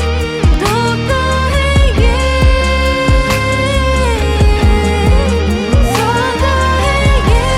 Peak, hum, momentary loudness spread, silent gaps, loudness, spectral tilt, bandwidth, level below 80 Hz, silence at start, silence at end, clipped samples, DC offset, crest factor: 0 dBFS; none; 2 LU; none; -12 LUFS; -5.5 dB/octave; 15 kHz; -14 dBFS; 0 s; 0 s; under 0.1%; under 0.1%; 10 dB